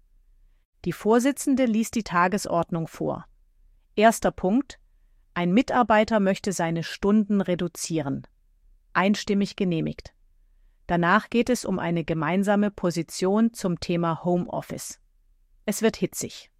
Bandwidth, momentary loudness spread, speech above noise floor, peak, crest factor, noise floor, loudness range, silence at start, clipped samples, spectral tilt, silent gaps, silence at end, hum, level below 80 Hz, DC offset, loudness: 15.5 kHz; 12 LU; 37 dB; -4 dBFS; 20 dB; -61 dBFS; 3 LU; 0.85 s; under 0.1%; -5.5 dB/octave; none; 0.15 s; none; -52 dBFS; under 0.1%; -24 LUFS